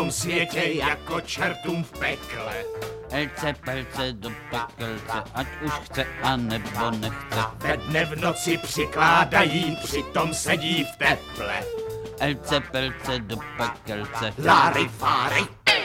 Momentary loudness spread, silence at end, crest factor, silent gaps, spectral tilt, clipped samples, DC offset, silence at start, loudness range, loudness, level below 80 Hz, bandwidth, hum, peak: 12 LU; 0 s; 22 dB; none; -4 dB/octave; under 0.1%; under 0.1%; 0 s; 7 LU; -25 LUFS; -46 dBFS; 17 kHz; none; -4 dBFS